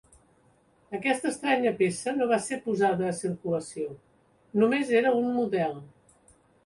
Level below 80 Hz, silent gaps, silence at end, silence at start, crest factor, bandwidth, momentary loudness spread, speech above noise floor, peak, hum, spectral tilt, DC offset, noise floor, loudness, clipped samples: -68 dBFS; none; 0.8 s; 0.9 s; 18 dB; 11.5 kHz; 10 LU; 37 dB; -10 dBFS; none; -5 dB/octave; under 0.1%; -64 dBFS; -27 LUFS; under 0.1%